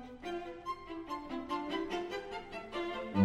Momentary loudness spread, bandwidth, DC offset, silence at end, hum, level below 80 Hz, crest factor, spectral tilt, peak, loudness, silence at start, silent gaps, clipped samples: 6 LU; 13.5 kHz; under 0.1%; 0 s; none; -60 dBFS; 20 dB; -6.5 dB/octave; -18 dBFS; -40 LUFS; 0 s; none; under 0.1%